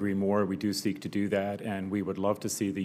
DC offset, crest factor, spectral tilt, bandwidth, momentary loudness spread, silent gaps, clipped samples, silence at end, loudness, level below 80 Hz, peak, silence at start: under 0.1%; 14 dB; -5.5 dB/octave; 16 kHz; 5 LU; none; under 0.1%; 0 s; -31 LUFS; -72 dBFS; -14 dBFS; 0 s